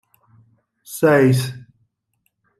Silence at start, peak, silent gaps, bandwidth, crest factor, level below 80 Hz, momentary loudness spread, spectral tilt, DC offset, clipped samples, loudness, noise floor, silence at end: 0.9 s; -4 dBFS; none; 15 kHz; 18 dB; -62 dBFS; 21 LU; -6.5 dB/octave; under 0.1%; under 0.1%; -17 LUFS; -71 dBFS; 1 s